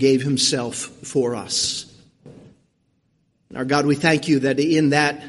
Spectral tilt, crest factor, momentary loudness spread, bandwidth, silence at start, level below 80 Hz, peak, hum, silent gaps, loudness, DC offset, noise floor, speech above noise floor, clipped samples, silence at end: -4 dB/octave; 18 dB; 12 LU; 11.5 kHz; 0 s; -58 dBFS; -2 dBFS; none; none; -20 LUFS; under 0.1%; -66 dBFS; 47 dB; under 0.1%; 0 s